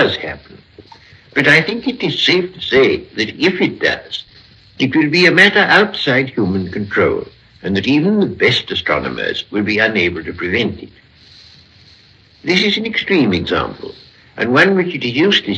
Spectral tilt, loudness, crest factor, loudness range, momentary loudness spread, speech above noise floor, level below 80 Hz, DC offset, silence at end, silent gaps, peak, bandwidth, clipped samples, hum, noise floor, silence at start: -5.5 dB/octave; -14 LUFS; 16 dB; 5 LU; 12 LU; 32 dB; -48 dBFS; under 0.1%; 0 s; none; 0 dBFS; 11 kHz; under 0.1%; none; -47 dBFS; 0 s